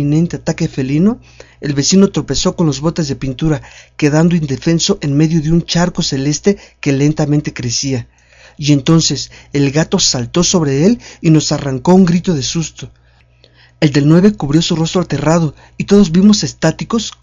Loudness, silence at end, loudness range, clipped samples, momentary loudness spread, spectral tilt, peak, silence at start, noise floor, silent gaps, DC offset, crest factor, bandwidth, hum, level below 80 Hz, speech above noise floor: -13 LUFS; 0.15 s; 3 LU; 0.3%; 9 LU; -5 dB/octave; 0 dBFS; 0 s; -48 dBFS; none; under 0.1%; 14 dB; 7.8 kHz; none; -36 dBFS; 35 dB